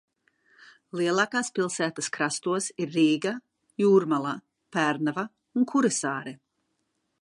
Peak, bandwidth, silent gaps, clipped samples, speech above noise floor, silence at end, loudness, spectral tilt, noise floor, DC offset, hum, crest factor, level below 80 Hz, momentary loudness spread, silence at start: -10 dBFS; 11.5 kHz; none; under 0.1%; 51 dB; 0.85 s; -26 LUFS; -4 dB/octave; -77 dBFS; under 0.1%; none; 18 dB; -80 dBFS; 12 LU; 0.95 s